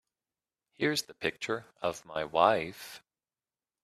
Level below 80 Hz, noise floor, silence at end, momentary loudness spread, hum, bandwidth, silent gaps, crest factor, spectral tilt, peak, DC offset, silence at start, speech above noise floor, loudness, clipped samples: -70 dBFS; under -90 dBFS; 0.85 s; 18 LU; none; 15 kHz; none; 26 dB; -3.5 dB/octave; -8 dBFS; under 0.1%; 0.8 s; over 59 dB; -31 LUFS; under 0.1%